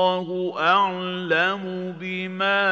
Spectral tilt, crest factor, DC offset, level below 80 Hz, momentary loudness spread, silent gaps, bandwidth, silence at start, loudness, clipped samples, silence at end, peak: -6 dB/octave; 16 dB; under 0.1%; -80 dBFS; 10 LU; none; 7.4 kHz; 0 s; -23 LUFS; under 0.1%; 0 s; -6 dBFS